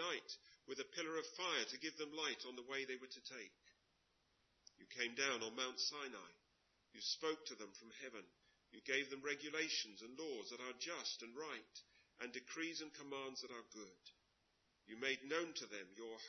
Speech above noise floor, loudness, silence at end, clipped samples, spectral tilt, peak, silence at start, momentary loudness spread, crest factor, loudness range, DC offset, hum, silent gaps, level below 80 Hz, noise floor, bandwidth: 34 dB; -46 LUFS; 0 s; under 0.1%; 0.5 dB/octave; -24 dBFS; 0 s; 15 LU; 24 dB; 5 LU; under 0.1%; none; none; under -90 dBFS; -81 dBFS; 6.2 kHz